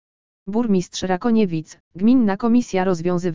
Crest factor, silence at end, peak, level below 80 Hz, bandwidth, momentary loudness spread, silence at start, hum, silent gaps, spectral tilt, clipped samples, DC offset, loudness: 14 dB; 0 s; -6 dBFS; -52 dBFS; 7.6 kHz; 10 LU; 0.45 s; none; 1.80-1.91 s; -6.5 dB/octave; under 0.1%; 2%; -20 LUFS